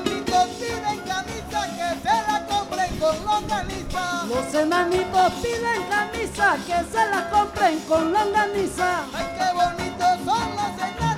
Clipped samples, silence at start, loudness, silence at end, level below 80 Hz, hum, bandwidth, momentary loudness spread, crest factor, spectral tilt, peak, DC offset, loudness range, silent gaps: under 0.1%; 0 s; -23 LUFS; 0 s; -44 dBFS; none; 16.5 kHz; 7 LU; 16 dB; -4 dB/octave; -6 dBFS; under 0.1%; 3 LU; none